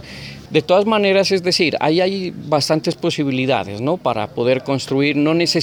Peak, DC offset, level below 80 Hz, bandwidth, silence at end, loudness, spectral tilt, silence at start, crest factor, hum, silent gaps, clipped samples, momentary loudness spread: -2 dBFS; under 0.1%; -56 dBFS; 20 kHz; 0 s; -17 LUFS; -5 dB/octave; 0 s; 16 dB; none; none; under 0.1%; 6 LU